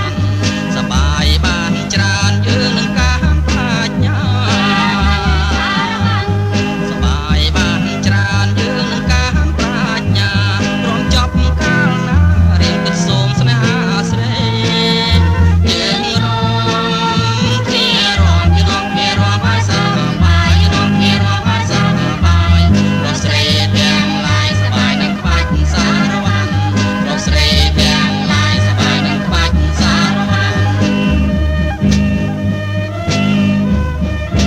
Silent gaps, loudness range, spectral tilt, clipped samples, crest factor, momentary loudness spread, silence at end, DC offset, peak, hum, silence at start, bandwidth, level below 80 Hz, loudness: none; 2 LU; -5 dB/octave; under 0.1%; 12 dB; 4 LU; 0 s; under 0.1%; 0 dBFS; none; 0 s; 12.5 kHz; -20 dBFS; -13 LUFS